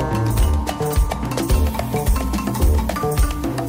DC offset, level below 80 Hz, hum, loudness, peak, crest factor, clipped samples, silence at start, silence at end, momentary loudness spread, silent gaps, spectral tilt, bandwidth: under 0.1%; -20 dBFS; none; -20 LUFS; -6 dBFS; 12 dB; under 0.1%; 0 s; 0 s; 3 LU; none; -6 dB/octave; 16.5 kHz